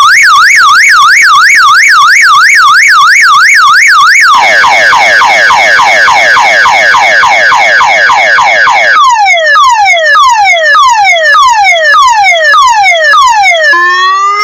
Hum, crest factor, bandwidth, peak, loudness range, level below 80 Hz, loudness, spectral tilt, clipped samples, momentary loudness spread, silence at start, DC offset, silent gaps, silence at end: none; 2 dB; over 20 kHz; 0 dBFS; 2 LU; -44 dBFS; -2 LUFS; 1 dB/octave; 10%; 3 LU; 0 s; under 0.1%; none; 0 s